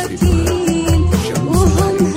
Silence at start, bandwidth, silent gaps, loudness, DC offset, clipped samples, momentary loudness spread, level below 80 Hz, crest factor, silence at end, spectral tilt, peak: 0 s; 16.5 kHz; none; -15 LUFS; under 0.1%; under 0.1%; 3 LU; -22 dBFS; 12 dB; 0 s; -6 dB/octave; -2 dBFS